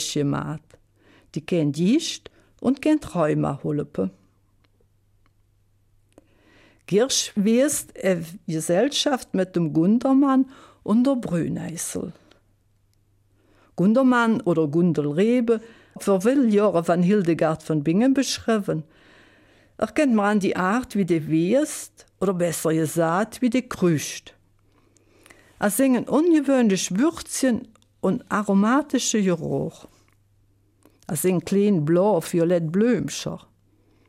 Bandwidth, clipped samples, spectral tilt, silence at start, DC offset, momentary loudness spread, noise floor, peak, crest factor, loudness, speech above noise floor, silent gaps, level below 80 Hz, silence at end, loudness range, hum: 16 kHz; under 0.1%; -5.5 dB/octave; 0 s; under 0.1%; 10 LU; -63 dBFS; -8 dBFS; 14 dB; -22 LUFS; 42 dB; none; -58 dBFS; 0.7 s; 5 LU; none